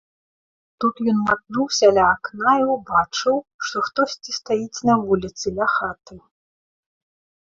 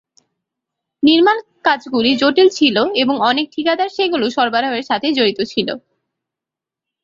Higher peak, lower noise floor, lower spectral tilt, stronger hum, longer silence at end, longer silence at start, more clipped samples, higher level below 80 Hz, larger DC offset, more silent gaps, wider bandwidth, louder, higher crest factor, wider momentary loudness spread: about the same, -2 dBFS vs -2 dBFS; first, under -90 dBFS vs -86 dBFS; about the same, -4 dB/octave vs -4 dB/octave; neither; about the same, 1.25 s vs 1.25 s; second, 0.8 s vs 1 s; neither; first, -54 dBFS vs -60 dBFS; neither; first, 3.54-3.59 s vs none; about the same, 7.8 kHz vs 7.6 kHz; second, -20 LUFS vs -15 LUFS; about the same, 18 dB vs 16 dB; about the same, 8 LU vs 7 LU